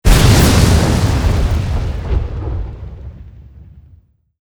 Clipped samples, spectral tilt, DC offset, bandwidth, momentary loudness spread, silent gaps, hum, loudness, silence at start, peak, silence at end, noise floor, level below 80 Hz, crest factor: under 0.1%; -5.5 dB/octave; under 0.1%; over 20 kHz; 22 LU; none; none; -14 LUFS; 0.05 s; 0 dBFS; 0.6 s; -48 dBFS; -18 dBFS; 14 dB